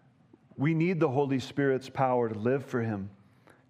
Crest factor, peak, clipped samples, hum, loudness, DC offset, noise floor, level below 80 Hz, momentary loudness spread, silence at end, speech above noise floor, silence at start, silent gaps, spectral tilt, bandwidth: 18 dB; -12 dBFS; under 0.1%; none; -29 LUFS; under 0.1%; -61 dBFS; -74 dBFS; 6 LU; 0.6 s; 33 dB; 0.55 s; none; -8 dB/octave; 11 kHz